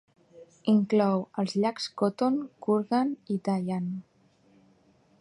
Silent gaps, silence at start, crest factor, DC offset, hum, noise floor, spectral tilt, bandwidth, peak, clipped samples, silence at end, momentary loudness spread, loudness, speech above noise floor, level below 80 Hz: none; 0.35 s; 16 dB; under 0.1%; none; -63 dBFS; -7 dB/octave; 11 kHz; -12 dBFS; under 0.1%; 1.2 s; 8 LU; -28 LUFS; 36 dB; -74 dBFS